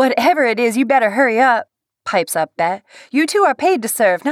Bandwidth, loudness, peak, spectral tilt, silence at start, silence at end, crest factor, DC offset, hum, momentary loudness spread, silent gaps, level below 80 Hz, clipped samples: 17.5 kHz; -16 LUFS; -4 dBFS; -3.5 dB/octave; 0 s; 0 s; 12 dB; under 0.1%; none; 7 LU; none; -74 dBFS; under 0.1%